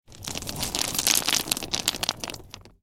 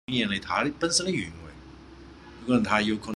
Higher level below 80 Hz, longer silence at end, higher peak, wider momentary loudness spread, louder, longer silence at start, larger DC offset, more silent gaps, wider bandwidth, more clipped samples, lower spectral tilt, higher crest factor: about the same, -50 dBFS vs -52 dBFS; first, 0.15 s vs 0 s; first, 0 dBFS vs -8 dBFS; second, 14 LU vs 20 LU; about the same, -25 LUFS vs -26 LUFS; about the same, 0.1 s vs 0.1 s; first, 0.2% vs under 0.1%; neither; first, 17 kHz vs 12.5 kHz; neither; second, -0.5 dB/octave vs -3.5 dB/octave; first, 28 dB vs 20 dB